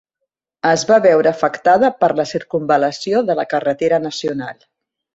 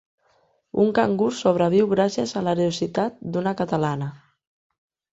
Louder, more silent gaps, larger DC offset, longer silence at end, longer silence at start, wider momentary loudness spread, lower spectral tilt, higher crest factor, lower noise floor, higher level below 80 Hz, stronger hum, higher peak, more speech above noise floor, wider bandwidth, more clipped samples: first, -16 LUFS vs -22 LUFS; neither; neither; second, 0.6 s vs 0.95 s; about the same, 0.65 s vs 0.75 s; first, 10 LU vs 7 LU; second, -4.5 dB/octave vs -6.5 dB/octave; about the same, 16 dB vs 18 dB; first, -78 dBFS vs -64 dBFS; about the same, -60 dBFS vs -60 dBFS; neither; first, 0 dBFS vs -6 dBFS; first, 62 dB vs 42 dB; about the same, 8 kHz vs 8 kHz; neither